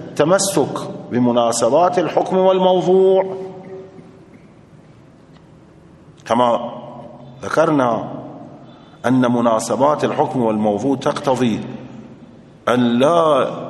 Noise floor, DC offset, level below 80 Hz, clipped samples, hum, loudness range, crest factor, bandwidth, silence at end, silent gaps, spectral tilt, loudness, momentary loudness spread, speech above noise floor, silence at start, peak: -45 dBFS; under 0.1%; -60 dBFS; under 0.1%; none; 9 LU; 18 dB; 12 kHz; 0 s; none; -5.5 dB/octave; -16 LUFS; 21 LU; 29 dB; 0 s; 0 dBFS